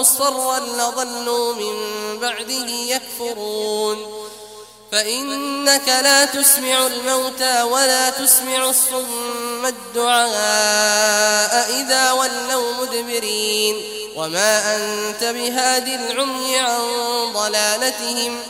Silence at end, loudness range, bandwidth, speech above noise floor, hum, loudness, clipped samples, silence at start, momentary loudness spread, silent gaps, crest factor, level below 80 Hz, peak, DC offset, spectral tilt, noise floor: 0 s; 8 LU; 16 kHz; 21 dB; none; -17 LUFS; under 0.1%; 0 s; 10 LU; none; 18 dB; -64 dBFS; 0 dBFS; under 0.1%; 0.5 dB/octave; -39 dBFS